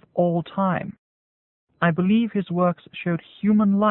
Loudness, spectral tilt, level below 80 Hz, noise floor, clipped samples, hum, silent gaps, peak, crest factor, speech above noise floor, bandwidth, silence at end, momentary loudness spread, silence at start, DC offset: -22 LUFS; -12.5 dB/octave; -62 dBFS; under -90 dBFS; under 0.1%; none; 0.98-1.67 s; -6 dBFS; 16 dB; over 69 dB; 4 kHz; 0 s; 9 LU; 0.15 s; under 0.1%